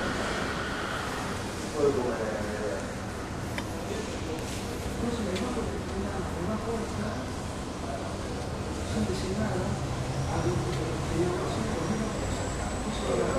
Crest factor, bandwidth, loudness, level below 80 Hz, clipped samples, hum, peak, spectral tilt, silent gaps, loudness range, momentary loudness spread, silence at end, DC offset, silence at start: 18 dB; 15 kHz; -32 LUFS; -42 dBFS; under 0.1%; none; -14 dBFS; -5.5 dB/octave; none; 3 LU; 5 LU; 0 s; under 0.1%; 0 s